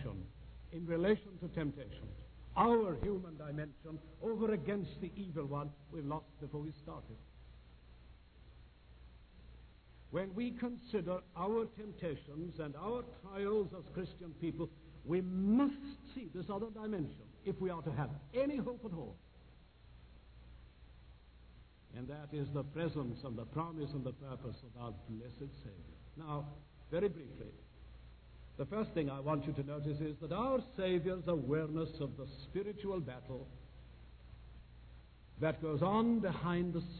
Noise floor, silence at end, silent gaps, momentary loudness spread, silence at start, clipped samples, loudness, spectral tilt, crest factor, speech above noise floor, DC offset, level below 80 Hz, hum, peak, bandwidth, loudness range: -61 dBFS; 0 s; none; 23 LU; 0 s; under 0.1%; -40 LUFS; -7 dB/octave; 22 dB; 22 dB; under 0.1%; -58 dBFS; none; -20 dBFS; 4.5 kHz; 10 LU